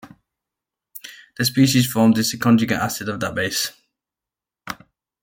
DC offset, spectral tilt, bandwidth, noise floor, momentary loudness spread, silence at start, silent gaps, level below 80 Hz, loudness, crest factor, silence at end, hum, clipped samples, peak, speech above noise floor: under 0.1%; -4.5 dB/octave; 17 kHz; -88 dBFS; 21 LU; 0.05 s; none; -58 dBFS; -19 LUFS; 18 dB; 0.5 s; none; under 0.1%; -4 dBFS; 70 dB